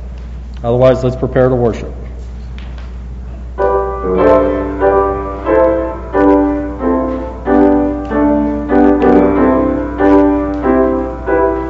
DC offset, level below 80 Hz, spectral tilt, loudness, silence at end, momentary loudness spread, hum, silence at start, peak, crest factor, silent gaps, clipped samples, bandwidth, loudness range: under 0.1%; -26 dBFS; -9 dB/octave; -12 LUFS; 0 s; 18 LU; none; 0 s; 0 dBFS; 12 dB; none; 0.1%; 7.4 kHz; 4 LU